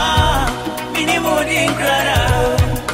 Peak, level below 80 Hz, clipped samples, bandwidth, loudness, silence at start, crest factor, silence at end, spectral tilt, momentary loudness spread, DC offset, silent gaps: -2 dBFS; -26 dBFS; under 0.1%; 16.5 kHz; -16 LUFS; 0 s; 14 dB; 0 s; -4 dB/octave; 5 LU; under 0.1%; none